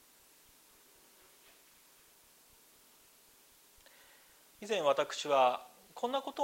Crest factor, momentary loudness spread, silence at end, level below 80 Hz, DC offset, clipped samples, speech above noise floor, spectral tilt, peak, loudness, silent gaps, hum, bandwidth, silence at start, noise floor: 24 dB; 22 LU; 0 s; -82 dBFS; under 0.1%; under 0.1%; 32 dB; -2.5 dB/octave; -14 dBFS; -33 LUFS; none; none; 16 kHz; 4.6 s; -64 dBFS